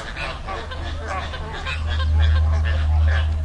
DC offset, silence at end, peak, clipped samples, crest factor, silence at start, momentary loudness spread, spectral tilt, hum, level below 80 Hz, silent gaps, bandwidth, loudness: under 0.1%; 0 s; -10 dBFS; under 0.1%; 12 dB; 0 s; 11 LU; -6 dB/octave; none; -24 dBFS; none; 8.4 kHz; -23 LUFS